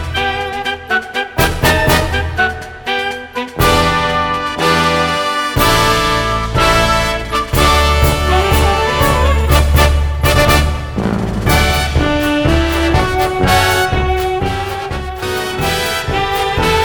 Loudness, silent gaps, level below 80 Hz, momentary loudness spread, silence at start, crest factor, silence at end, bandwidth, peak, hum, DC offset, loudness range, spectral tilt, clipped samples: -14 LUFS; none; -20 dBFS; 8 LU; 0 s; 14 dB; 0 s; 19.5 kHz; 0 dBFS; none; under 0.1%; 3 LU; -4.5 dB/octave; under 0.1%